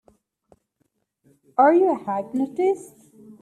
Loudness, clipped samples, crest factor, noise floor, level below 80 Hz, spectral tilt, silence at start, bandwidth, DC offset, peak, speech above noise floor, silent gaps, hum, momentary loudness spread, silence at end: -21 LUFS; under 0.1%; 18 dB; -72 dBFS; -74 dBFS; -7 dB/octave; 1.6 s; 12.5 kHz; under 0.1%; -6 dBFS; 52 dB; none; none; 11 LU; 0.1 s